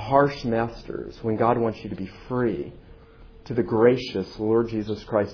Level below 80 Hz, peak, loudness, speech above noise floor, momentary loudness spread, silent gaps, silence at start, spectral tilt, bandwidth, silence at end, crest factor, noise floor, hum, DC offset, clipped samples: -48 dBFS; -4 dBFS; -25 LUFS; 24 dB; 14 LU; none; 0 s; -8 dB/octave; 5.4 kHz; 0 s; 20 dB; -47 dBFS; none; under 0.1%; under 0.1%